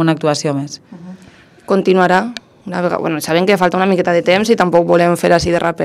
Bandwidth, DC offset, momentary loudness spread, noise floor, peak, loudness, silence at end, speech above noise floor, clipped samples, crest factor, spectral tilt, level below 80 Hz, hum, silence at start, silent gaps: 14.5 kHz; under 0.1%; 14 LU; -43 dBFS; 0 dBFS; -14 LUFS; 0 s; 30 dB; 0.3%; 14 dB; -5.5 dB/octave; -46 dBFS; none; 0 s; none